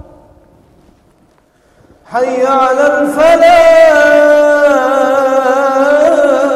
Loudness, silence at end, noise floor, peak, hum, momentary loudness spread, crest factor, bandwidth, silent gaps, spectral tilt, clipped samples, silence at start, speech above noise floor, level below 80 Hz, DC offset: -8 LUFS; 0 s; -50 dBFS; 0 dBFS; none; 6 LU; 10 dB; 14.5 kHz; none; -3.5 dB/octave; 0.3%; 2.1 s; 43 dB; -46 dBFS; under 0.1%